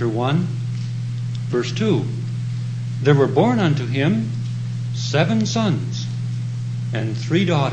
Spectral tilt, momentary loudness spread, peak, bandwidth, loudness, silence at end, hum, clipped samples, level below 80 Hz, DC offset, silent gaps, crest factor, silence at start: -6.5 dB/octave; 9 LU; -2 dBFS; 8.8 kHz; -21 LUFS; 0 s; none; under 0.1%; -54 dBFS; under 0.1%; none; 18 dB; 0 s